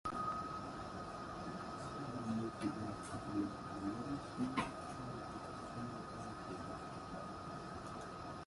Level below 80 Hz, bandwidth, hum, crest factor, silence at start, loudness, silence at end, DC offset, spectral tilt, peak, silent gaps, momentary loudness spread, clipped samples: -62 dBFS; 11.5 kHz; none; 20 dB; 0.05 s; -45 LUFS; 0 s; under 0.1%; -6 dB/octave; -24 dBFS; none; 7 LU; under 0.1%